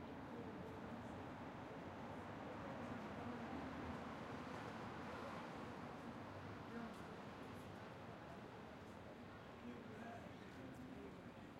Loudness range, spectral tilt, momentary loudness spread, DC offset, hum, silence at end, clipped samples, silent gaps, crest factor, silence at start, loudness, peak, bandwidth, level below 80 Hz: 5 LU; -6.5 dB/octave; 6 LU; under 0.1%; none; 0 s; under 0.1%; none; 16 dB; 0 s; -53 LUFS; -38 dBFS; 16 kHz; -72 dBFS